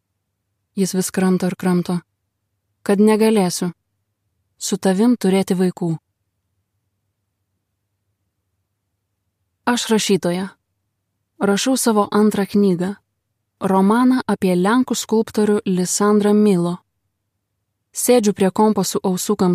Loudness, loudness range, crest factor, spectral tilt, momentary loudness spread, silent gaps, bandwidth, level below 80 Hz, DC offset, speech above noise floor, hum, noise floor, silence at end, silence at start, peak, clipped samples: -18 LUFS; 6 LU; 16 dB; -5.5 dB/octave; 11 LU; none; 15.5 kHz; -64 dBFS; under 0.1%; 58 dB; none; -74 dBFS; 0 s; 0.75 s; -2 dBFS; under 0.1%